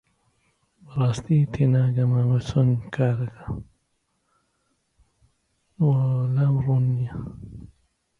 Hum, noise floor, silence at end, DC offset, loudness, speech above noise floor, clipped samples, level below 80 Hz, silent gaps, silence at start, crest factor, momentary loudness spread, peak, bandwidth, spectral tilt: none; -72 dBFS; 0.55 s; under 0.1%; -23 LUFS; 51 dB; under 0.1%; -50 dBFS; none; 0.9 s; 16 dB; 15 LU; -8 dBFS; 7.4 kHz; -9 dB/octave